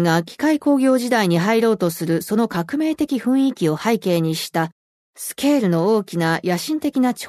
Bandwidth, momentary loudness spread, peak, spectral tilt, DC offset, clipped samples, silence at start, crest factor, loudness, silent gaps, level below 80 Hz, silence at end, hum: 13.5 kHz; 5 LU; -4 dBFS; -5.5 dB/octave; under 0.1%; under 0.1%; 0 s; 14 dB; -19 LUFS; 4.72-5.13 s; -62 dBFS; 0 s; none